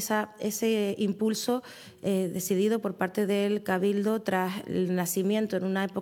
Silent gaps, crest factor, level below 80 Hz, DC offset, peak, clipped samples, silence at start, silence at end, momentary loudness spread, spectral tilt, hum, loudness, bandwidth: none; 16 dB; -76 dBFS; under 0.1%; -12 dBFS; under 0.1%; 0 s; 0 s; 4 LU; -5 dB/octave; none; -28 LUFS; 19 kHz